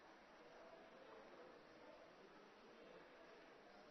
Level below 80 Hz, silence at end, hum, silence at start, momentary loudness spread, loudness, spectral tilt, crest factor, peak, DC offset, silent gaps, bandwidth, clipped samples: -88 dBFS; 0 s; none; 0 s; 3 LU; -64 LUFS; -2 dB/octave; 14 dB; -50 dBFS; under 0.1%; none; 6.2 kHz; under 0.1%